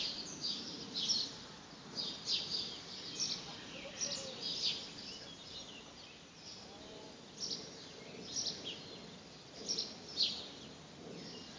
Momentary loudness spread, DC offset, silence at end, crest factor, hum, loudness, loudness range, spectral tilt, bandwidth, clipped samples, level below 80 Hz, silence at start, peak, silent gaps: 17 LU; under 0.1%; 0 s; 24 dB; none; -40 LUFS; 6 LU; -1.5 dB/octave; 7.8 kHz; under 0.1%; -72 dBFS; 0 s; -20 dBFS; none